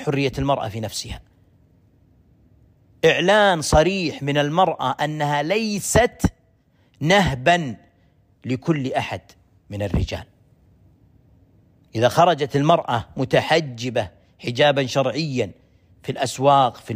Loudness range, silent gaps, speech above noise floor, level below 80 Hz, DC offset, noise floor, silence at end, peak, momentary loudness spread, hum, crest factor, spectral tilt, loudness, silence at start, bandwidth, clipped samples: 9 LU; none; 40 dB; -40 dBFS; under 0.1%; -59 dBFS; 0 s; -4 dBFS; 15 LU; none; 18 dB; -5 dB/octave; -20 LUFS; 0 s; 15.5 kHz; under 0.1%